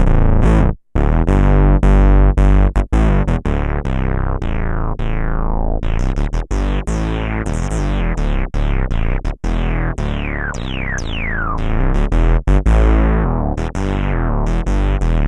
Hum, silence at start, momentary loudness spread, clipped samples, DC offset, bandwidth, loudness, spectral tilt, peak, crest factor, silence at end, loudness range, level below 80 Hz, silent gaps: none; 0 s; 9 LU; under 0.1%; under 0.1%; 8.8 kHz; -18 LUFS; -7.5 dB/octave; -2 dBFS; 12 dB; 0 s; 6 LU; -16 dBFS; none